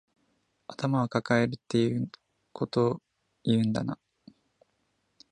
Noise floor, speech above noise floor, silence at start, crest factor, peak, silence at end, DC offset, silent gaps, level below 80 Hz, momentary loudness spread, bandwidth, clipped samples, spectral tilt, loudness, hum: -75 dBFS; 48 dB; 0.7 s; 22 dB; -8 dBFS; 1.35 s; under 0.1%; none; -66 dBFS; 15 LU; 9.8 kHz; under 0.1%; -7 dB/octave; -29 LUFS; none